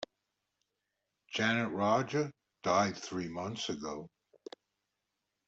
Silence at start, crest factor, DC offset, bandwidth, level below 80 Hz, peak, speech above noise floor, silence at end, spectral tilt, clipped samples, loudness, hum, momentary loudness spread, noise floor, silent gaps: 0 s; 20 dB; under 0.1%; 8 kHz; -74 dBFS; -16 dBFS; 53 dB; 1.4 s; -4.5 dB/octave; under 0.1%; -34 LUFS; none; 20 LU; -86 dBFS; none